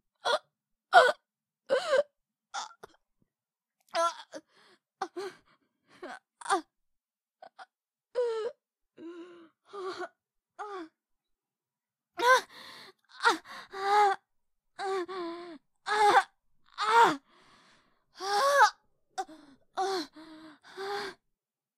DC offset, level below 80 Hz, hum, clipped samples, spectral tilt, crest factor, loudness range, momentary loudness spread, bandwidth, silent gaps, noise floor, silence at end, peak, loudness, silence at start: under 0.1%; -80 dBFS; none; under 0.1%; -1.5 dB/octave; 26 dB; 11 LU; 24 LU; 16 kHz; none; under -90 dBFS; 0.65 s; -6 dBFS; -29 LUFS; 0.25 s